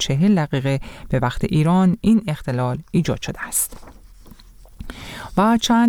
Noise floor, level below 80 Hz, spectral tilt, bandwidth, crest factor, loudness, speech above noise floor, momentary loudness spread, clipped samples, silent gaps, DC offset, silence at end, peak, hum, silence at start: -43 dBFS; -40 dBFS; -5.5 dB/octave; 18.5 kHz; 14 dB; -20 LUFS; 25 dB; 13 LU; under 0.1%; none; under 0.1%; 0 s; -6 dBFS; none; 0 s